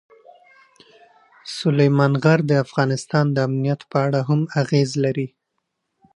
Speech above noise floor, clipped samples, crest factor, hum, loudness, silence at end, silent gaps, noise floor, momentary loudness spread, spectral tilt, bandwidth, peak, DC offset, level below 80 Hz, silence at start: 57 dB; under 0.1%; 20 dB; none; -20 LUFS; 0.9 s; none; -76 dBFS; 8 LU; -7 dB/octave; 11 kHz; -2 dBFS; under 0.1%; -66 dBFS; 1.45 s